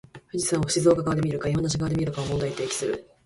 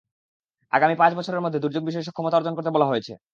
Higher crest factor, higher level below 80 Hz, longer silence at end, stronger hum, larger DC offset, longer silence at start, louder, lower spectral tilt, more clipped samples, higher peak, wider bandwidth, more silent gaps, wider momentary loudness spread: about the same, 18 dB vs 20 dB; first, -48 dBFS vs -74 dBFS; about the same, 0.25 s vs 0.15 s; neither; neither; second, 0.15 s vs 0.75 s; about the same, -25 LUFS vs -23 LUFS; second, -5 dB/octave vs -7 dB/octave; neither; second, -8 dBFS vs -2 dBFS; first, 11.5 kHz vs 7.4 kHz; neither; about the same, 7 LU vs 9 LU